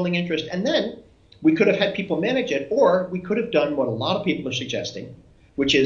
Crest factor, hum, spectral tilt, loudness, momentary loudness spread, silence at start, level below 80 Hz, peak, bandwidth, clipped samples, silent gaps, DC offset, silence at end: 18 dB; none; -5.5 dB/octave; -22 LUFS; 10 LU; 0 s; -56 dBFS; -4 dBFS; 7.6 kHz; under 0.1%; none; under 0.1%; 0 s